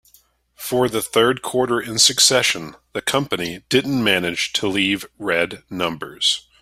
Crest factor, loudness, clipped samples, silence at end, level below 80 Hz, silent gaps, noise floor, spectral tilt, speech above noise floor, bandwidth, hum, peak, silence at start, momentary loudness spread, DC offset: 20 dB; -19 LUFS; under 0.1%; 0.2 s; -56 dBFS; none; -56 dBFS; -2.5 dB/octave; 36 dB; 16 kHz; none; 0 dBFS; 0.6 s; 11 LU; under 0.1%